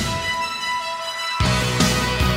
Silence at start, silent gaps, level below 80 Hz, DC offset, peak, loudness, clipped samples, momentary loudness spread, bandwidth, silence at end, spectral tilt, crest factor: 0 s; none; -32 dBFS; under 0.1%; -4 dBFS; -21 LUFS; under 0.1%; 6 LU; 16 kHz; 0 s; -3.5 dB/octave; 18 dB